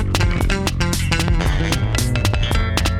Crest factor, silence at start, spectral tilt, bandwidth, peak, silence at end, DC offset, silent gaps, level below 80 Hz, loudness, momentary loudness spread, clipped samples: 16 dB; 0 s; -4.5 dB/octave; 17 kHz; -2 dBFS; 0 s; under 0.1%; none; -22 dBFS; -19 LUFS; 1 LU; under 0.1%